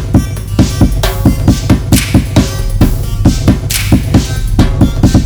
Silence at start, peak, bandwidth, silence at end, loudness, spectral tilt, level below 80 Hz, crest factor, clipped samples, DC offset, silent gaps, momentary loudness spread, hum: 0 s; 0 dBFS; over 20 kHz; 0 s; -11 LUFS; -6 dB/octave; -16 dBFS; 10 dB; 2%; under 0.1%; none; 3 LU; none